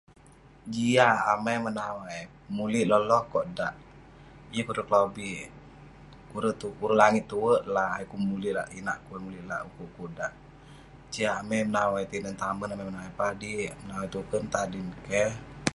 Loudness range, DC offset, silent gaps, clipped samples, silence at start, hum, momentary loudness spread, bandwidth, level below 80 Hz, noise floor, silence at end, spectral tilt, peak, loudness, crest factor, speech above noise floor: 7 LU; under 0.1%; none; under 0.1%; 0.45 s; none; 15 LU; 11.5 kHz; -56 dBFS; -54 dBFS; 0 s; -5 dB/octave; -4 dBFS; -29 LUFS; 24 dB; 26 dB